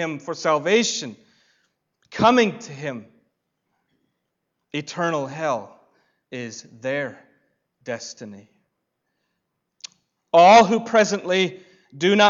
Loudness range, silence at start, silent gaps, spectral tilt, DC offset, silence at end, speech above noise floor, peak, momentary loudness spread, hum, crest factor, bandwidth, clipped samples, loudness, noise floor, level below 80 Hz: 15 LU; 0 s; none; -4 dB/octave; under 0.1%; 0 s; 58 dB; -4 dBFS; 23 LU; none; 18 dB; 7.8 kHz; under 0.1%; -20 LUFS; -77 dBFS; -66 dBFS